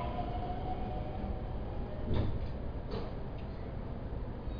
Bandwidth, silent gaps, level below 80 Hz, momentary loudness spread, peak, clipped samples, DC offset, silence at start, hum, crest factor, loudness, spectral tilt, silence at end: 5.2 kHz; none; -40 dBFS; 7 LU; -20 dBFS; under 0.1%; under 0.1%; 0 s; none; 18 dB; -40 LUFS; -7 dB/octave; 0 s